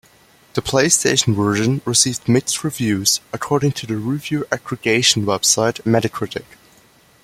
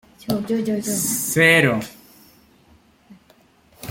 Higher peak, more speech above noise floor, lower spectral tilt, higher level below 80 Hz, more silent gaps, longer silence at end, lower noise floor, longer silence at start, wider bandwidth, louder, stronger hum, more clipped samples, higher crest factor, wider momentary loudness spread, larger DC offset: about the same, 0 dBFS vs -2 dBFS; about the same, 34 dB vs 36 dB; about the same, -3.5 dB/octave vs -3.5 dB/octave; first, -52 dBFS vs -58 dBFS; neither; first, 0.85 s vs 0 s; about the same, -52 dBFS vs -55 dBFS; first, 0.55 s vs 0.25 s; about the same, 16.5 kHz vs 17 kHz; about the same, -17 LUFS vs -18 LUFS; neither; neither; about the same, 18 dB vs 20 dB; second, 10 LU vs 14 LU; neither